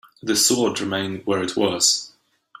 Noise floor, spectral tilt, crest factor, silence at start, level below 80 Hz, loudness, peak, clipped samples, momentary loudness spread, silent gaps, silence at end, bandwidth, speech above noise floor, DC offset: -50 dBFS; -2 dB/octave; 18 dB; 0.25 s; -62 dBFS; -20 LUFS; -4 dBFS; under 0.1%; 8 LU; none; 0.5 s; 16 kHz; 29 dB; under 0.1%